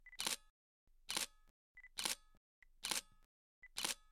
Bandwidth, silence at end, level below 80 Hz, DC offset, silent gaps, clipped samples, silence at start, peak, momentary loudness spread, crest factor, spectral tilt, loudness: 16.5 kHz; 0.15 s; -70 dBFS; under 0.1%; 0.50-0.87 s, 1.50-1.75 s, 2.37-2.62 s, 3.25-3.62 s; under 0.1%; 0.05 s; -20 dBFS; 8 LU; 28 dB; 1 dB/octave; -43 LUFS